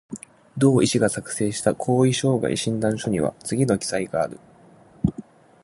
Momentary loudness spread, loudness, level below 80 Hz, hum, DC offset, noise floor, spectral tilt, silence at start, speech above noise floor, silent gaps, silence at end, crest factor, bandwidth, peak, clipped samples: 9 LU; -22 LUFS; -50 dBFS; none; under 0.1%; -51 dBFS; -5.5 dB/octave; 0.1 s; 29 dB; none; 0.45 s; 18 dB; 11.5 kHz; -4 dBFS; under 0.1%